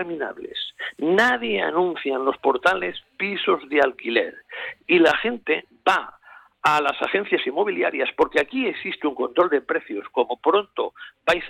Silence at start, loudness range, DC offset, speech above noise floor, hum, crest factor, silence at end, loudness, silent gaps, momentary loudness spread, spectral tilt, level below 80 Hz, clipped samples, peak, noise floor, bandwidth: 0 s; 1 LU; under 0.1%; 20 dB; none; 16 dB; 0 s; -22 LUFS; none; 11 LU; -4.5 dB/octave; -60 dBFS; under 0.1%; -6 dBFS; -42 dBFS; 14 kHz